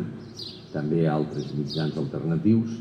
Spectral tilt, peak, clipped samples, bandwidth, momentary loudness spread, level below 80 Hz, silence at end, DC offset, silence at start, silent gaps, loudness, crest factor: -8 dB/octave; -10 dBFS; under 0.1%; 9 kHz; 14 LU; -58 dBFS; 0 s; under 0.1%; 0 s; none; -26 LUFS; 16 dB